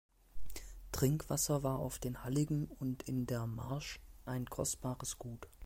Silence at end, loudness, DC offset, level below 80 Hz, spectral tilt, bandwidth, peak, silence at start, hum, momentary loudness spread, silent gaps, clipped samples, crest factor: 0 s; -38 LUFS; under 0.1%; -54 dBFS; -5.5 dB/octave; 16.5 kHz; -18 dBFS; 0.2 s; none; 15 LU; none; under 0.1%; 20 dB